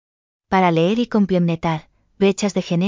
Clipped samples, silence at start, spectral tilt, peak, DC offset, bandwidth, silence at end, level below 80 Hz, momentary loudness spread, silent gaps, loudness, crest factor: under 0.1%; 0.5 s; -6.5 dB/octave; -2 dBFS; under 0.1%; 7.6 kHz; 0 s; -52 dBFS; 6 LU; none; -19 LUFS; 16 dB